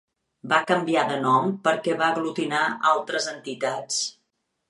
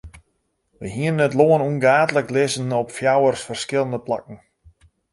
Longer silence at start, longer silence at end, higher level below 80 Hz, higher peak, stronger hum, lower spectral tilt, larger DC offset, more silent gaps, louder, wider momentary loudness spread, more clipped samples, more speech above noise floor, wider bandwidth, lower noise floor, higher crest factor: first, 0.45 s vs 0.05 s; second, 0.6 s vs 0.75 s; second, -76 dBFS vs -54 dBFS; second, -6 dBFS vs -2 dBFS; neither; second, -3.5 dB/octave vs -5.5 dB/octave; neither; neither; second, -24 LUFS vs -20 LUFS; second, 7 LU vs 11 LU; neither; about the same, 52 dB vs 51 dB; about the same, 11.5 kHz vs 11.5 kHz; first, -76 dBFS vs -70 dBFS; about the same, 18 dB vs 18 dB